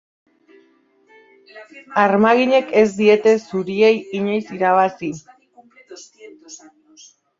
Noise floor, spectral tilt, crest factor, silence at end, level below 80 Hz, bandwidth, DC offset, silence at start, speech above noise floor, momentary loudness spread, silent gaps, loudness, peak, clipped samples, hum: -57 dBFS; -5.5 dB/octave; 18 dB; 0.85 s; -66 dBFS; 7.6 kHz; under 0.1%; 1.55 s; 41 dB; 17 LU; none; -17 LUFS; -2 dBFS; under 0.1%; none